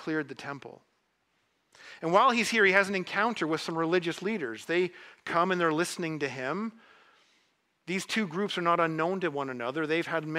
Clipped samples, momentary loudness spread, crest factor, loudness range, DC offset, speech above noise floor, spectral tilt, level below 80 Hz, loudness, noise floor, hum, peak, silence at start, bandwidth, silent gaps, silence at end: under 0.1%; 12 LU; 22 dB; 5 LU; under 0.1%; 45 dB; -4.5 dB/octave; -76 dBFS; -28 LUFS; -74 dBFS; none; -8 dBFS; 0 s; 15.5 kHz; none; 0 s